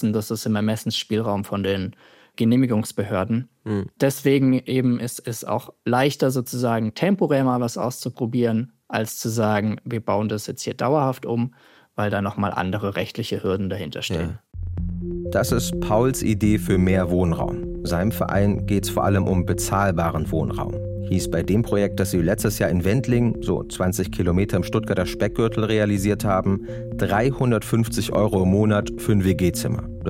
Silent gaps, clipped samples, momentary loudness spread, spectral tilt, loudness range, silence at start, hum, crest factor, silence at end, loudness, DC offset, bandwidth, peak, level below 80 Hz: none; under 0.1%; 8 LU; -6 dB/octave; 3 LU; 0 s; none; 16 dB; 0 s; -22 LUFS; under 0.1%; 16.5 kHz; -6 dBFS; -40 dBFS